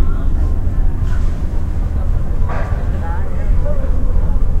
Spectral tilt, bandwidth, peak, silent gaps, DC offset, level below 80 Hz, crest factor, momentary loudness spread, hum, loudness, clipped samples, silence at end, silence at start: -8.5 dB/octave; 3.3 kHz; -2 dBFS; none; 0.8%; -14 dBFS; 10 dB; 2 LU; none; -20 LUFS; under 0.1%; 0 s; 0 s